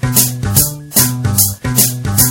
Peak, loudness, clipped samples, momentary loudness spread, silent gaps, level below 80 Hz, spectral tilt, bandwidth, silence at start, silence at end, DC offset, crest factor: 0 dBFS; -12 LUFS; 0.3%; 1 LU; none; -32 dBFS; -3 dB/octave; over 20 kHz; 0 s; 0 s; under 0.1%; 14 dB